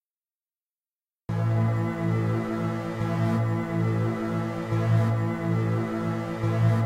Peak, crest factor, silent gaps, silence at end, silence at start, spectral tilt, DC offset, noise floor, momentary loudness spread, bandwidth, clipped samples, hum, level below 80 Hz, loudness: -12 dBFS; 14 dB; none; 0 s; 1.3 s; -8.5 dB/octave; under 0.1%; under -90 dBFS; 6 LU; 9.2 kHz; under 0.1%; none; -54 dBFS; -27 LUFS